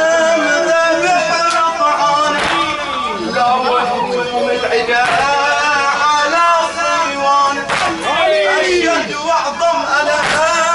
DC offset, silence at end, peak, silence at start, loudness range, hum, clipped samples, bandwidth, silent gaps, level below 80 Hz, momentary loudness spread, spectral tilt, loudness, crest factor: under 0.1%; 0 s; -4 dBFS; 0 s; 2 LU; none; under 0.1%; 11.5 kHz; none; -48 dBFS; 4 LU; -2 dB/octave; -13 LUFS; 10 dB